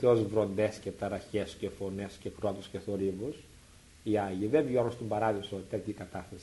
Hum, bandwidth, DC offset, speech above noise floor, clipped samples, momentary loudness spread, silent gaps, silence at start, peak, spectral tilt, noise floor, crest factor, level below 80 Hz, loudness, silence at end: none; 11.5 kHz; under 0.1%; 24 dB; under 0.1%; 12 LU; none; 0 s; -12 dBFS; -7 dB/octave; -56 dBFS; 20 dB; -60 dBFS; -33 LUFS; 0 s